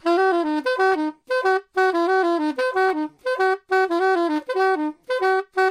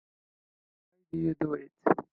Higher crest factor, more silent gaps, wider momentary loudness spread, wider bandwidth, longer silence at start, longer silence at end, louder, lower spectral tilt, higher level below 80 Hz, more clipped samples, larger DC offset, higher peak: second, 12 dB vs 24 dB; neither; about the same, 5 LU vs 6 LU; first, 12 kHz vs 4.5 kHz; second, 0.05 s vs 1.15 s; about the same, 0 s vs 0.1 s; first, -21 LUFS vs -32 LUFS; second, -3 dB/octave vs -11 dB/octave; second, -72 dBFS vs -66 dBFS; neither; neither; about the same, -8 dBFS vs -10 dBFS